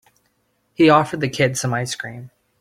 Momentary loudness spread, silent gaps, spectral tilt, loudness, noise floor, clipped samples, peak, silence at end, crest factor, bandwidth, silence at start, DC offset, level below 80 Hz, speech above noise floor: 20 LU; none; -5 dB/octave; -18 LUFS; -66 dBFS; under 0.1%; -2 dBFS; 0.35 s; 18 dB; 15.5 kHz; 0.8 s; under 0.1%; -58 dBFS; 48 dB